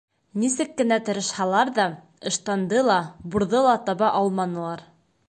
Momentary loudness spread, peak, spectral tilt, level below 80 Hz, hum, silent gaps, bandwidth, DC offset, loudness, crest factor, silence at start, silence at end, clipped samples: 9 LU; -6 dBFS; -4 dB/octave; -60 dBFS; none; none; 11 kHz; under 0.1%; -23 LUFS; 16 dB; 0.35 s; 0.45 s; under 0.1%